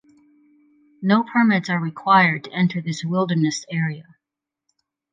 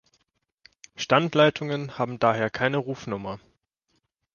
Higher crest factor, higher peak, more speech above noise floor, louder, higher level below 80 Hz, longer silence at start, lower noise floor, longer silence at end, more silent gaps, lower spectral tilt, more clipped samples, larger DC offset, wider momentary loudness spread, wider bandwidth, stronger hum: second, 18 dB vs 24 dB; about the same, -4 dBFS vs -4 dBFS; first, 66 dB vs 49 dB; first, -20 LUFS vs -25 LUFS; second, -70 dBFS vs -62 dBFS; about the same, 1 s vs 1 s; first, -86 dBFS vs -74 dBFS; about the same, 1.1 s vs 1 s; neither; about the same, -6 dB/octave vs -5.5 dB/octave; neither; neither; about the same, 11 LU vs 13 LU; first, 9.2 kHz vs 7.2 kHz; neither